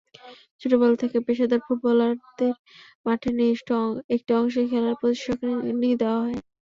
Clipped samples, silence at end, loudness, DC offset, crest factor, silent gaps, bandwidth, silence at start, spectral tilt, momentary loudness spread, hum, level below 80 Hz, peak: under 0.1%; 0.3 s; -24 LUFS; under 0.1%; 16 dB; 0.51-0.59 s, 2.59-2.65 s, 2.95-3.04 s, 4.04-4.09 s; 7.4 kHz; 0.25 s; -6.5 dB/octave; 6 LU; none; -60 dBFS; -8 dBFS